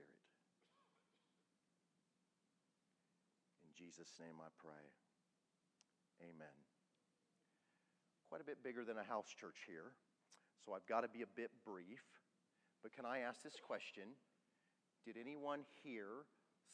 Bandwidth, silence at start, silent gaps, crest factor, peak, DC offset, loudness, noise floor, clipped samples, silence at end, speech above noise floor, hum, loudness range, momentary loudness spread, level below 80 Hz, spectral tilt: 9.6 kHz; 0 s; none; 28 dB; -28 dBFS; under 0.1%; -52 LUFS; -87 dBFS; under 0.1%; 0 s; 35 dB; none; 15 LU; 16 LU; under -90 dBFS; -4 dB/octave